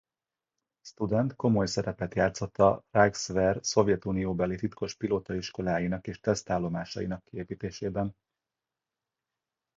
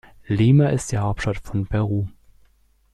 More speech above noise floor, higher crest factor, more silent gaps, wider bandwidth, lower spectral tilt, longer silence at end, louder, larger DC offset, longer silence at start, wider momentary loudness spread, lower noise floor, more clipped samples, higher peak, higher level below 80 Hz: first, over 61 dB vs 39 dB; first, 22 dB vs 16 dB; neither; second, 7.8 kHz vs 12 kHz; second, -5.5 dB/octave vs -7 dB/octave; first, 1.65 s vs 0.85 s; second, -29 LUFS vs -21 LUFS; neither; first, 0.85 s vs 0.3 s; about the same, 10 LU vs 11 LU; first, under -90 dBFS vs -59 dBFS; neither; about the same, -6 dBFS vs -6 dBFS; second, -52 dBFS vs -40 dBFS